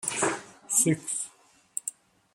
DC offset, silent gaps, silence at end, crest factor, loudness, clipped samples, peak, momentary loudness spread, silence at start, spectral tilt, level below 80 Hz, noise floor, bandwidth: under 0.1%; none; 0.45 s; 24 dB; -28 LUFS; under 0.1%; -8 dBFS; 15 LU; 0 s; -3 dB/octave; -72 dBFS; -60 dBFS; 16 kHz